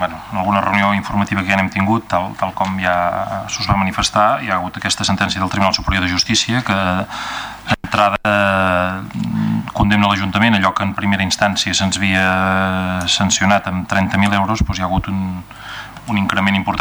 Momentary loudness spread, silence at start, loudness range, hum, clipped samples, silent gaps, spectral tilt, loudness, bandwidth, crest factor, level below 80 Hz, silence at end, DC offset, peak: 8 LU; 0 s; 2 LU; none; under 0.1%; none; -4 dB/octave; -16 LUFS; over 20 kHz; 16 dB; -36 dBFS; 0 s; under 0.1%; -2 dBFS